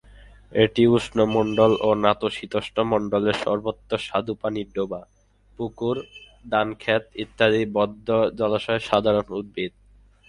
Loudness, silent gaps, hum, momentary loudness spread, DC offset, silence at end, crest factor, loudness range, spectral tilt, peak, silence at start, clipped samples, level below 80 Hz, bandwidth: -23 LUFS; none; none; 12 LU; under 0.1%; 0.6 s; 20 dB; 7 LU; -6.5 dB/octave; -2 dBFS; 0.5 s; under 0.1%; -52 dBFS; 11 kHz